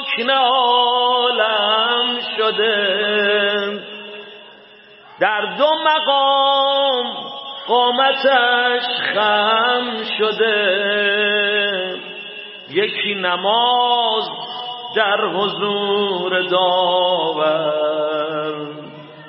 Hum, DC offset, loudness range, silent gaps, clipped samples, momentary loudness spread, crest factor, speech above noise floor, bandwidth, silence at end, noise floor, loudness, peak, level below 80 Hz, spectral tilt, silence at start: none; under 0.1%; 3 LU; none; under 0.1%; 13 LU; 16 dB; 27 dB; 5.8 kHz; 0 s; -44 dBFS; -16 LUFS; -2 dBFS; -74 dBFS; -8 dB/octave; 0 s